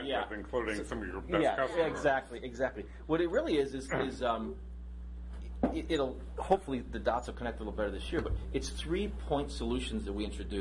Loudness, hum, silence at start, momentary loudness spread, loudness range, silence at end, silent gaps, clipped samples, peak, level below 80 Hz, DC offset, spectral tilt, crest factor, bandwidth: -34 LUFS; none; 0 s; 12 LU; 3 LU; 0 s; none; under 0.1%; -14 dBFS; -44 dBFS; under 0.1%; -5.5 dB/octave; 20 dB; 11.5 kHz